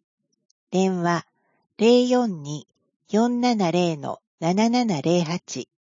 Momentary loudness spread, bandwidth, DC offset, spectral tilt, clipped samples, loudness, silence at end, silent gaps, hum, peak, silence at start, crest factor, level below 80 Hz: 15 LU; 7.6 kHz; under 0.1%; -6 dB/octave; under 0.1%; -22 LUFS; 0.35 s; 2.96-3.00 s, 4.27-4.38 s; none; -6 dBFS; 0.7 s; 18 dB; -72 dBFS